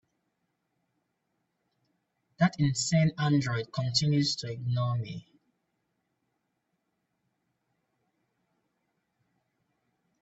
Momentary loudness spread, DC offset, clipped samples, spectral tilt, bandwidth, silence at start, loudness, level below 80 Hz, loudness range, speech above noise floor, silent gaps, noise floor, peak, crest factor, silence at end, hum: 8 LU; under 0.1%; under 0.1%; -5 dB/octave; 8.4 kHz; 2.4 s; -28 LUFS; -66 dBFS; 10 LU; 52 dB; none; -80 dBFS; -12 dBFS; 22 dB; 5 s; none